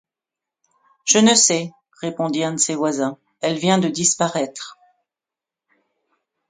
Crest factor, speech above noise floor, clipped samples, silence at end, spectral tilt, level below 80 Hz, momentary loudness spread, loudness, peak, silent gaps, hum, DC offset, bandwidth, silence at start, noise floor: 22 dB; 69 dB; under 0.1%; 1.75 s; -3 dB/octave; -68 dBFS; 17 LU; -18 LUFS; 0 dBFS; none; none; under 0.1%; 10 kHz; 1.05 s; -88 dBFS